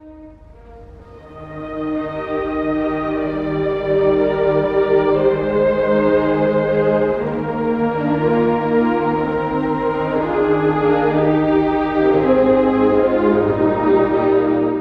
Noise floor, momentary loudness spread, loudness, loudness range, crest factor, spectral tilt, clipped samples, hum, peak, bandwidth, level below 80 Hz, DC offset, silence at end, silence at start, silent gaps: -40 dBFS; 6 LU; -17 LUFS; 5 LU; 14 dB; -9.5 dB/octave; under 0.1%; none; -2 dBFS; 5.4 kHz; -42 dBFS; under 0.1%; 0 s; 0.05 s; none